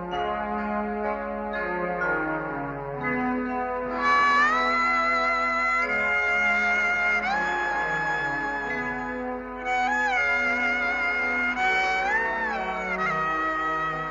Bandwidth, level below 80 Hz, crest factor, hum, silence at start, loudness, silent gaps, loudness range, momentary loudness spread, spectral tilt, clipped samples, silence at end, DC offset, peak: 8 kHz; -50 dBFS; 14 dB; none; 0 s; -24 LUFS; none; 6 LU; 8 LU; -4.5 dB/octave; under 0.1%; 0 s; under 0.1%; -12 dBFS